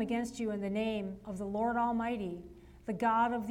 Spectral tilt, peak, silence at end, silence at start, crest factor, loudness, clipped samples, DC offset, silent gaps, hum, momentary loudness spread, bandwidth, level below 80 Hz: -6 dB/octave; -20 dBFS; 0 s; 0 s; 14 dB; -34 LUFS; under 0.1%; under 0.1%; none; none; 12 LU; 14.5 kHz; -60 dBFS